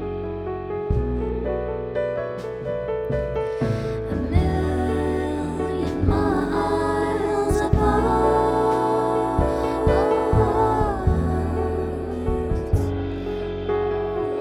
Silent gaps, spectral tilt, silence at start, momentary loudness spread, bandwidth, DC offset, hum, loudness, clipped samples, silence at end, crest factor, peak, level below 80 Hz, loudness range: none; -8 dB/octave; 0 s; 8 LU; 14.5 kHz; under 0.1%; none; -23 LUFS; under 0.1%; 0 s; 16 dB; -6 dBFS; -30 dBFS; 6 LU